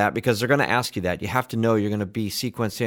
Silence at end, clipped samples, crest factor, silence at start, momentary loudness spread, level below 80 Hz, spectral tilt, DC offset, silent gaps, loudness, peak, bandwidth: 0 s; under 0.1%; 18 dB; 0 s; 7 LU; -54 dBFS; -5 dB/octave; under 0.1%; none; -23 LUFS; -4 dBFS; 19.5 kHz